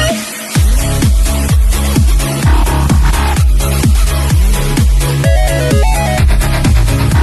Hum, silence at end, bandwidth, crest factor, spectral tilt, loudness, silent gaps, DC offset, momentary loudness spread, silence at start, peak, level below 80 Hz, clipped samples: none; 0 s; 13 kHz; 10 dB; -5 dB/octave; -12 LUFS; none; under 0.1%; 1 LU; 0 s; 0 dBFS; -12 dBFS; under 0.1%